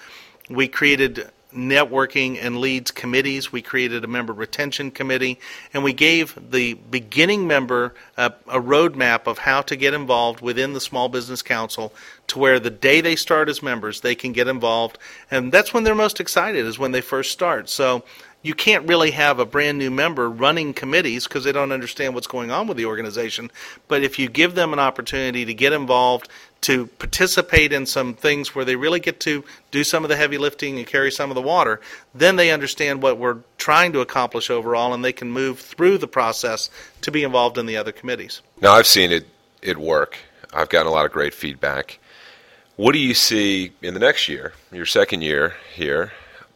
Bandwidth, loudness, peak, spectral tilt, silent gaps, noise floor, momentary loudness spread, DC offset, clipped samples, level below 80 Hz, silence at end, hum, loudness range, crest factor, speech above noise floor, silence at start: 16.5 kHz; -19 LUFS; 0 dBFS; -3 dB/octave; none; -49 dBFS; 12 LU; under 0.1%; under 0.1%; -48 dBFS; 0.15 s; none; 4 LU; 20 dB; 30 dB; 0 s